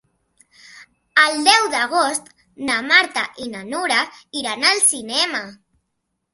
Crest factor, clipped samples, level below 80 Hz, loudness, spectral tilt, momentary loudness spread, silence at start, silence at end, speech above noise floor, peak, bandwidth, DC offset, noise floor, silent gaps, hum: 20 dB; under 0.1%; -66 dBFS; -17 LUFS; 0.5 dB/octave; 13 LU; 0.75 s; 0.8 s; 55 dB; 0 dBFS; 12 kHz; under 0.1%; -75 dBFS; none; none